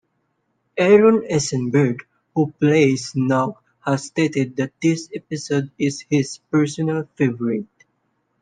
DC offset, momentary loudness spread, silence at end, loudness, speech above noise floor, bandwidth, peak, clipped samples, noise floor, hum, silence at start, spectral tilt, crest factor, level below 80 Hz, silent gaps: under 0.1%; 12 LU; 0.8 s; -20 LUFS; 51 dB; 9.8 kHz; -2 dBFS; under 0.1%; -70 dBFS; none; 0.75 s; -6 dB/octave; 18 dB; -62 dBFS; none